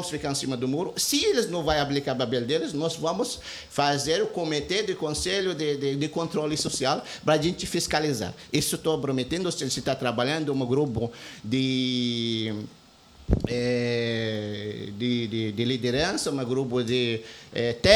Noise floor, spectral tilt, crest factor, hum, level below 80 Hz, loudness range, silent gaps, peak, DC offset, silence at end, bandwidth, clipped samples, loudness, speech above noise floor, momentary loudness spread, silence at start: -52 dBFS; -4 dB/octave; 22 dB; none; -46 dBFS; 2 LU; none; -4 dBFS; under 0.1%; 0 s; 19 kHz; under 0.1%; -27 LUFS; 26 dB; 6 LU; 0 s